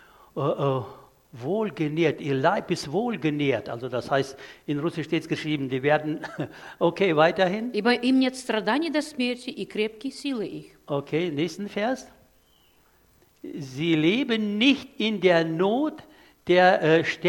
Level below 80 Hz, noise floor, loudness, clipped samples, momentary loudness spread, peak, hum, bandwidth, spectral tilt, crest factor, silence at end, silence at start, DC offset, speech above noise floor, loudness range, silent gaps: -66 dBFS; -61 dBFS; -25 LUFS; under 0.1%; 13 LU; -4 dBFS; none; 17 kHz; -6 dB/octave; 20 dB; 0 s; 0.35 s; under 0.1%; 36 dB; 6 LU; none